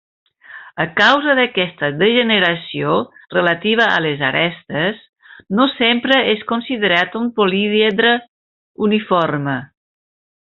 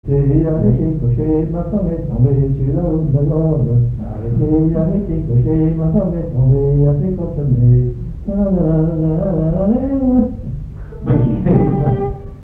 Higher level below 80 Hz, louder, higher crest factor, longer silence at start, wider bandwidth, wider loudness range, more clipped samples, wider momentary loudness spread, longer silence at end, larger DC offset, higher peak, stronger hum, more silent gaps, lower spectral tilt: second, -60 dBFS vs -26 dBFS; about the same, -16 LUFS vs -16 LUFS; about the same, 16 dB vs 14 dB; first, 0.5 s vs 0.05 s; first, 7.4 kHz vs 2.8 kHz; about the same, 2 LU vs 1 LU; neither; about the same, 8 LU vs 7 LU; first, 0.8 s vs 0 s; neither; about the same, -2 dBFS vs 0 dBFS; neither; first, 5.09-5.13 s, 8.28-8.75 s vs none; second, -2 dB/octave vs -13 dB/octave